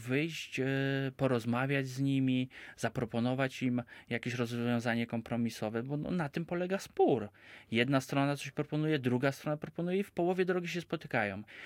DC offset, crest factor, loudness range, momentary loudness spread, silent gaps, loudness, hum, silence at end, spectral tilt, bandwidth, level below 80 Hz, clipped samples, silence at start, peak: under 0.1%; 20 dB; 2 LU; 7 LU; none; -34 LUFS; none; 0 s; -6.5 dB/octave; 16.5 kHz; -68 dBFS; under 0.1%; 0 s; -14 dBFS